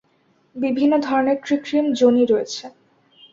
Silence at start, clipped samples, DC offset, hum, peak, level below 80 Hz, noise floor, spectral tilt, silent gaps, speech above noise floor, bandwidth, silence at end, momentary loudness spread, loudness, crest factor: 0.55 s; under 0.1%; under 0.1%; none; -4 dBFS; -64 dBFS; -61 dBFS; -4.5 dB/octave; none; 43 dB; 7.6 kHz; 0.65 s; 12 LU; -19 LUFS; 16 dB